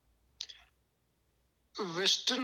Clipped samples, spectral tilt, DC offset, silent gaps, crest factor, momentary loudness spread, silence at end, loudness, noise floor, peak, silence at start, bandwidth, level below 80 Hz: under 0.1%; -1.5 dB/octave; under 0.1%; none; 22 dB; 18 LU; 0 s; -31 LUFS; -76 dBFS; -16 dBFS; 0.4 s; 18 kHz; -76 dBFS